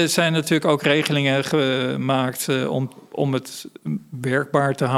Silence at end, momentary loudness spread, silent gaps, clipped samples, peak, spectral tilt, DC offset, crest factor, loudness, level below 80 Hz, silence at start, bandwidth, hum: 0 s; 11 LU; none; under 0.1%; -2 dBFS; -5 dB/octave; under 0.1%; 20 dB; -21 LUFS; -66 dBFS; 0 s; 16 kHz; none